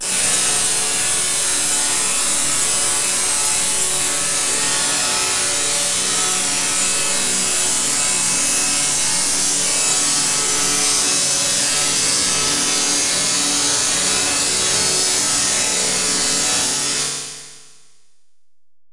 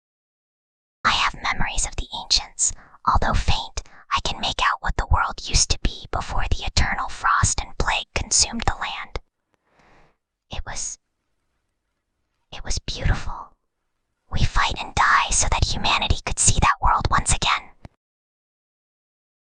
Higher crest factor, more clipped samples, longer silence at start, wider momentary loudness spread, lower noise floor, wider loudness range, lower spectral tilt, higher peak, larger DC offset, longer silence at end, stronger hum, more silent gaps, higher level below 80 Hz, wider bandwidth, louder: second, 14 dB vs 22 dB; neither; second, 0 s vs 1.05 s; second, 2 LU vs 14 LU; first, -82 dBFS vs -75 dBFS; second, 1 LU vs 13 LU; second, 0.5 dB/octave vs -2 dB/octave; about the same, -4 dBFS vs -2 dBFS; neither; second, 0 s vs 1.7 s; neither; neither; second, -50 dBFS vs -30 dBFS; first, 12 kHz vs 10 kHz; first, -15 LUFS vs -22 LUFS